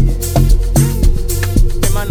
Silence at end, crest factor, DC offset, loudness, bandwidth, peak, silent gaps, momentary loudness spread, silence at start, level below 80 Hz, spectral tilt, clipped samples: 0 s; 10 dB; under 0.1%; -15 LUFS; 19 kHz; -2 dBFS; none; 4 LU; 0 s; -12 dBFS; -5.5 dB/octave; under 0.1%